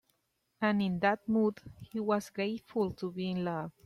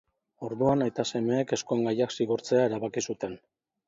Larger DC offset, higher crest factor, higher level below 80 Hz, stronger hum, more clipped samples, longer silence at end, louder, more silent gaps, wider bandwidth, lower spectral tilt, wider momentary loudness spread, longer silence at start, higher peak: neither; about the same, 18 dB vs 18 dB; about the same, -66 dBFS vs -66 dBFS; neither; neither; second, 0.15 s vs 0.5 s; second, -33 LUFS vs -28 LUFS; neither; first, 13 kHz vs 7.8 kHz; first, -7 dB/octave vs -5.5 dB/octave; second, 7 LU vs 12 LU; first, 0.6 s vs 0.4 s; second, -14 dBFS vs -10 dBFS